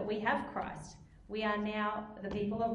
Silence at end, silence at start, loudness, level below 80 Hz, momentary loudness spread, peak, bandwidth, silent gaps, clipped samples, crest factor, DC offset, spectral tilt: 0 s; 0 s; -36 LUFS; -58 dBFS; 13 LU; -18 dBFS; 11 kHz; none; under 0.1%; 18 dB; under 0.1%; -6 dB/octave